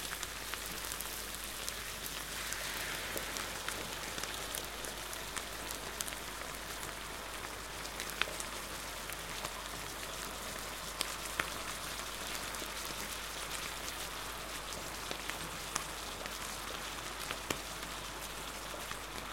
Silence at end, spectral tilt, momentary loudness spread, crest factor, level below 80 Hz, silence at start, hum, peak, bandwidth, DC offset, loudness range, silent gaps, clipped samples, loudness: 0 s; -1.5 dB/octave; 4 LU; 34 dB; -54 dBFS; 0 s; none; -8 dBFS; 17 kHz; under 0.1%; 2 LU; none; under 0.1%; -40 LUFS